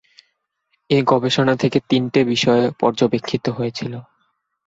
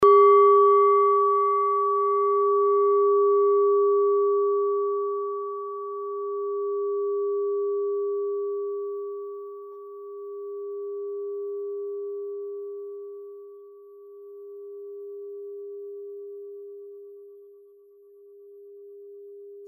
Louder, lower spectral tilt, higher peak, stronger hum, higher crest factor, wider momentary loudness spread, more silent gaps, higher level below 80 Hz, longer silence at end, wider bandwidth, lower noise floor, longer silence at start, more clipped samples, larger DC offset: first, -18 LUFS vs -23 LUFS; second, -6 dB/octave vs -7.5 dB/octave; first, -2 dBFS vs -8 dBFS; neither; about the same, 18 dB vs 16 dB; second, 9 LU vs 22 LU; neither; first, -56 dBFS vs -74 dBFS; first, 0.65 s vs 0 s; first, 8 kHz vs 3.4 kHz; first, -70 dBFS vs -53 dBFS; first, 0.9 s vs 0 s; neither; neither